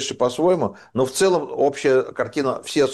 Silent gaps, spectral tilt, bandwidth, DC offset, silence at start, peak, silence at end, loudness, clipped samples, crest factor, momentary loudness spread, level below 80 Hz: none; -4.5 dB/octave; 12.5 kHz; under 0.1%; 0 s; -8 dBFS; 0 s; -21 LUFS; under 0.1%; 12 dB; 6 LU; -60 dBFS